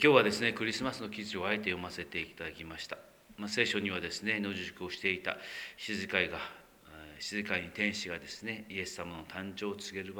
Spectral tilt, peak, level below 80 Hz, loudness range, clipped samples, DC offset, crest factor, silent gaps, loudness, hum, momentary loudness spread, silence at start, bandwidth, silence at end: -4 dB/octave; -8 dBFS; -66 dBFS; 3 LU; under 0.1%; under 0.1%; 26 dB; none; -35 LUFS; none; 12 LU; 0 s; over 20 kHz; 0 s